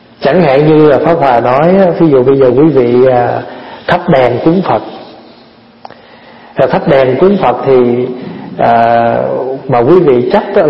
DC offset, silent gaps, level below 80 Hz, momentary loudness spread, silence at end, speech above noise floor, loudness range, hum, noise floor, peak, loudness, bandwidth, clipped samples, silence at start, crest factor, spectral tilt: under 0.1%; none; -42 dBFS; 9 LU; 0 s; 32 dB; 6 LU; none; -39 dBFS; 0 dBFS; -8 LUFS; 5.8 kHz; 0.6%; 0.2 s; 8 dB; -9.5 dB/octave